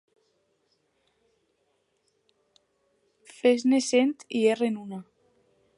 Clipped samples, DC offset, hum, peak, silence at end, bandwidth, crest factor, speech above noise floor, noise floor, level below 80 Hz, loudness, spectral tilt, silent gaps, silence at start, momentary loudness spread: under 0.1%; under 0.1%; none; -10 dBFS; 0.75 s; 11.5 kHz; 20 dB; 49 dB; -73 dBFS; -82 dBFS; -25 LUFS; -4 dB/octave; none; 3.45 s; 15 LU